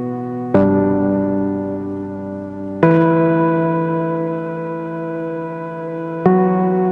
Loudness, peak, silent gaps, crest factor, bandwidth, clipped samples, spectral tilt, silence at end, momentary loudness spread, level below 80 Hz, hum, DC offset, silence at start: -18 LUFS; -2 dBFS; none; 16 dB; 4.3 kHz; under 0.1%; -11 dB/octave; 0 s; 12 LU; -54 dBFS; none; under 0.1%; 0 s